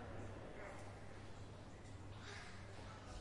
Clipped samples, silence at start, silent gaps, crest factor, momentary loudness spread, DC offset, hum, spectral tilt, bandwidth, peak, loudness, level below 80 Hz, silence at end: under 0.1%; 0 s; none; 14 dB; 4 LU; under 0.1%; none; -5 dB/octave; 11.5 kHz; -38 dBFS; -55 LUFS; -62 dBFS; 0 s